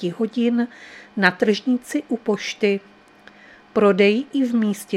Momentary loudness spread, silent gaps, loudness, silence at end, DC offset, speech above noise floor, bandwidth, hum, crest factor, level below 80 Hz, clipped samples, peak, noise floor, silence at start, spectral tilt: 9 LU; none; -20 LUFS; 0 s; under 0.1%; 28 dB; 14.5 kHz; none; 20 dB; -68 dBFS; under 0.1%; 0 dBFS; -48 dBFS; 0 s; -5.5 dB/octave